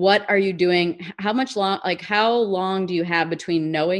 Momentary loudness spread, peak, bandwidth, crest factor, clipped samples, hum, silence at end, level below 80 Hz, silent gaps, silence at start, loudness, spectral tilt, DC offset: 6 LU; -4 dBFS; 11 kHz; 18 dB; under 0.1%; none; 0 s; -66 dBFS; none; 0 s; -21 LUFS; -5.5 dB/octave; under 0.1%